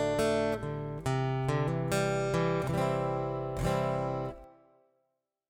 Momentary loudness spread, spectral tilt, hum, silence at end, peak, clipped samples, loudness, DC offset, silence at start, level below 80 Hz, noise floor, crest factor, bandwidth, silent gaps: 6 LU; -6.5 dB/octave; none; 1 s; -16 dBFS; under 0.1%; -31 LUFS; under 0.1%; 0 s; -50 dBFS; -81 dBFS; 16 dB; 17.5 kHz; none